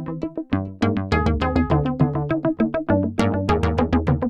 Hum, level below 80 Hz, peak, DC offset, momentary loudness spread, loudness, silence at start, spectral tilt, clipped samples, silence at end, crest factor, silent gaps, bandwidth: none; -32 dBFS; -4 dBFS; under 0.1%; 6 LU; -21 LUFS; 0 s; -8 dB/octave; under 0.1%; 0 s; 18 dB; none; 10.5 kHz